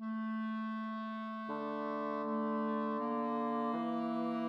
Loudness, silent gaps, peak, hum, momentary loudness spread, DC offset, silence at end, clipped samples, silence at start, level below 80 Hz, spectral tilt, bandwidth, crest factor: -38 LUFS; none; -26 dBFS; none; 5 LU; under 0.1%; 0 s; under 0.1%; 0 s; under -90 dBFS; -8 dB/octave; 5.6 kHz; 10 dB